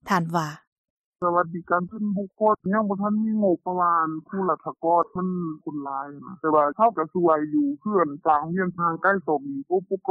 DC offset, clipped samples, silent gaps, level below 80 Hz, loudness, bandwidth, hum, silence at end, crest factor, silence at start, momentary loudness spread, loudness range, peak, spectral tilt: under 0.1%; under 0.1%; 0.67-0.84 s, 0.90-1.12 s; -66 dBFS; -24 LUFS; 10 kHz; none; 0 s; 16 dB; 0.05 s; 8 LU; 2 LU; -8 dBFS; -8 dB/octave